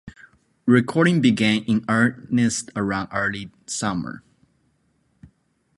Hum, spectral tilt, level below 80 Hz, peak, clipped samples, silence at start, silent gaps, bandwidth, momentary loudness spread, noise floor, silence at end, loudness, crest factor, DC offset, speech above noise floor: none; -5 dB/octave; -56 dBFS; -2 dBFS; under 0.1%; 0.05 s; none; 11.5 kHz; 12 LU; -66 dBFS; 1.6 s; -21 LUFS; 20 dB; under 0.1%; 45 dB